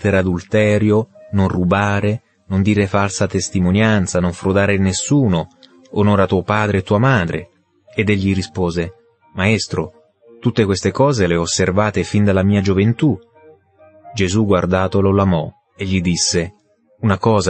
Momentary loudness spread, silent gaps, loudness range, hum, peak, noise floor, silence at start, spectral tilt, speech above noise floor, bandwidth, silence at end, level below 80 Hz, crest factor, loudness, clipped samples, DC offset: 9 LU; none; 2 LU; none; -2 dBFS; -48 dBFS; 0 s; -5.5 dB/octave; 33 dB; 8.8 kHz; 0 s; -44 dBFS; 14 dB; -17 LUFS; under 0.1%; under 0.1%